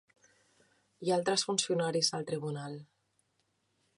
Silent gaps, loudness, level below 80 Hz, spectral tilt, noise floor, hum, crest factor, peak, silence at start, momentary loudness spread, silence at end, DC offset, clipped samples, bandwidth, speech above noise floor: none; -32 LUFS; -82 dBFS; -3.5 dB/octave; -77 dBFS; none; 20 dB; -16 dBFS; 1 s; 12 LU; 1.15 s; under 0.1%; under 0.1%; 11 kHz; 45 dB